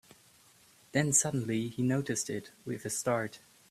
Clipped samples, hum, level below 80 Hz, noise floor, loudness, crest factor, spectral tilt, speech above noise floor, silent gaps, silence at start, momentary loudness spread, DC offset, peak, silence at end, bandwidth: under 0.1%; none; -68 dBFS; -62 dBFS; -32 LUFS; 22 dB; -4 dB/octave; 30 dB; none; 0.95 s; 13 LU; under 0.1%; -12 dBFS; 0.35 s; 15.5 kHz